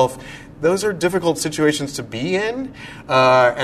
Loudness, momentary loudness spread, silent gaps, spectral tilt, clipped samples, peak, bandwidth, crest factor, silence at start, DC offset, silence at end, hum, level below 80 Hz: -19 LUFS; 17 LU; none; -4.5 dB/octave; under 0.1%; -2 dBFS; 13.5 kHz; 16 dB; 0 s; under 0.1%; 0 s; none; -50 dBFS